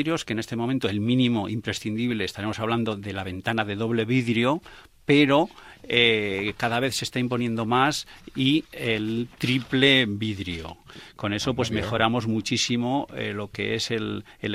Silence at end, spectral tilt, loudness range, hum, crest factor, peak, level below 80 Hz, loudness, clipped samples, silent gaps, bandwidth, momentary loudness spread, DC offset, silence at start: 0 s; -5 dB/octave; 4 LU; none; 22 dB; -4 dBFS; -54 dBFS; -24 LUFS; under 0.1%; none; 15.5 kHz; 11 LU; under 0.1%; 0 s